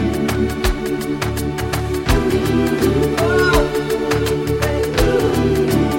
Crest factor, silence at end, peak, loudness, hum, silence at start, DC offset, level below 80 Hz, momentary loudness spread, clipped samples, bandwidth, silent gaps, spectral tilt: 14 dB; 0 s; -2 dBFS; -18 LUFS; none; 0 s; 0.1%; -26 dBFS; 6 LU; under 0.1%; 17 kHz; none; -5.5 dB/octave